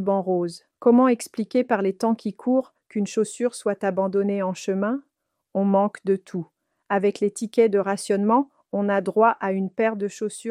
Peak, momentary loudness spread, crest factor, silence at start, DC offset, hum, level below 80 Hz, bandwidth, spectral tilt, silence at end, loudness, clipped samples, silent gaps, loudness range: -6 dBFS; 9 LU; 18 dB; 0 s; under 0.1%; none; -74 dBFS; 14 kHz; -6.5 dB/octave; 0 s; -23 LUFS; under 0.1%; none; 3 LU